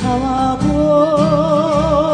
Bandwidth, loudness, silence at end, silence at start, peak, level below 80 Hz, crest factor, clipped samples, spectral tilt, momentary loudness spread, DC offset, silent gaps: 10 kHz; -14 LUFS; 0 s; 0 s; -2 dBFS; -30 dBFS; 12 dB; under 0.1%; -7 dB/octave; 4 LU; under 0.1%; none